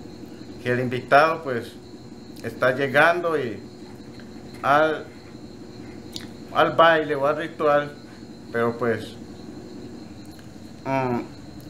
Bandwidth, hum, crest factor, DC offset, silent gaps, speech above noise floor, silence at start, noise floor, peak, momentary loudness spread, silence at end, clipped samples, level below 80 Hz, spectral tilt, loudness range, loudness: 16 kHz; none; 22 dB; 0.3%; none; 20 dB; 0 s; -41 dBFS; -2 dBFS; 23 LU; 0 s; under 0.1%; -58 dBFS; -5.5 dB/octave; 7 LU; -22 LUFS